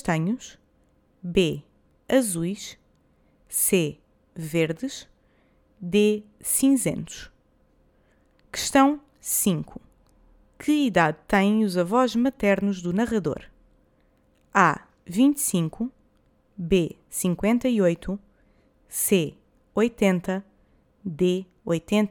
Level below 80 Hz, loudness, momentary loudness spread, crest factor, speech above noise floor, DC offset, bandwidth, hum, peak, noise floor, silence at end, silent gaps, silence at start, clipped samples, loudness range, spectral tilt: -52 dBFS; -24 LUFS; 15 LU; 22 dB; 40 dB; under 0.1%; 19 kHz; none; -4 dBFS; -63 dBFS; 0 s; none; 0.05 s; under 0.1%; 4 LU; -4.5 dB/octave